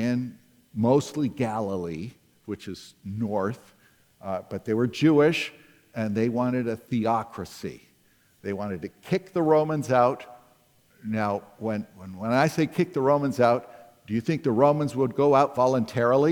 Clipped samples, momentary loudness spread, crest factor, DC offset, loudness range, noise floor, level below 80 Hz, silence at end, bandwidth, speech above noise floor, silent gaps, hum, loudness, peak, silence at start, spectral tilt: under 0.1%; 17 LU; 20 dB; under 0.1%; 6 LU; -62 dBFS; -66 dBFS; 0 s; 19 kHz; 38 dB; none; none; -25 LUFS; -6 dBFS; 0 s; -7 dB/octave